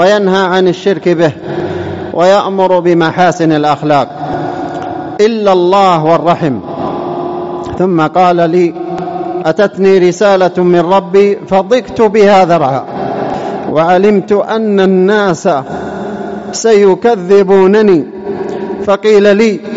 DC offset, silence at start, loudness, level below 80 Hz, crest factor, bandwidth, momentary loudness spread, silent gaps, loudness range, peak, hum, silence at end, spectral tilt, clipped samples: 0.3%; 0 s; -10 LUFS; -48 dBFS; 10 dB; 8 kHz; 11 LU; none; 3 LU; 0 dBFS; none; 0 s; -6 dB/octave; under 0.1%